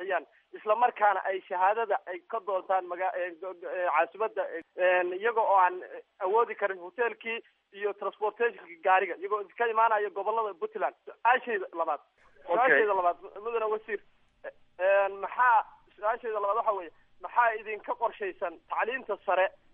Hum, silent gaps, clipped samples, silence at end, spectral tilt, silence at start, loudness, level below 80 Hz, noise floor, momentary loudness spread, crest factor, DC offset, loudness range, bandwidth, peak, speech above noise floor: none; none; under 0.1%; 0.25 s; 0 dB/octave; 0 s; -29 LUFS; -74 dBFS; -48 dBFS; 12 LU; 20 dB; under 0.1%; 3 LU; 3.8 kHz; -10 dBFS; 19 dB